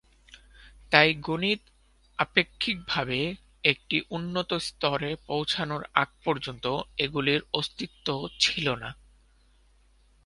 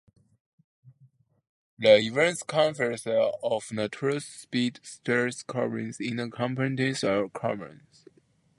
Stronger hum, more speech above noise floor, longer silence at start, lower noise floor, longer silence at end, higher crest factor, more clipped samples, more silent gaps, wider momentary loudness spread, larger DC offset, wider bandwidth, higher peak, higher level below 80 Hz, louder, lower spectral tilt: neither; second, 33 dB vs 38 dB; second, 0.6 s vs 0.85 s; second, -61 dBFS vs -65 dBFS; first, 1.3 s vs 0.85 s; about the same, 28 dB vs 24 dB; neither; second, none vs 1.49-1.77 s; second, 9 LU vs 12 LU; neither; about the same, 11.5 kHz vs 11.5 kHz; first, 0 dBFS vs -4 dBFS; first, -56 dBFS vs -70 dBFS; about the same, -27 LUFS vs -27 LUFS; about the same, -4 dB/octave vs -5 dB/octave